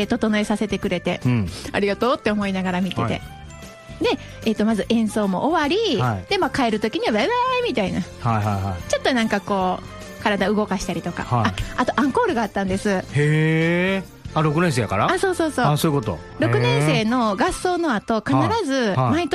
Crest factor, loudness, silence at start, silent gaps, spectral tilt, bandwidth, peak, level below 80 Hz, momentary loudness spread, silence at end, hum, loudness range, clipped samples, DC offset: 16 dB; -21 LUFS; 0 s; none; -6 dB/octave; 15 kHz; -4 dBFS; -44 dBFS; 6 LU; 0 s; none; 3 LU; under 0.1%; under 0.1%